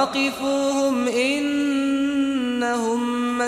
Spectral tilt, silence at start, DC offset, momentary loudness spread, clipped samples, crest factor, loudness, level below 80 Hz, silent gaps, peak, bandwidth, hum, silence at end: -3 dB/octave; 0 s; under 0.1%; 2 LU; under 0.1%; 12 dB; -22 LUFS; -60 dBFS; none; -8 dBFS; 14.5 kHz; none; 0 s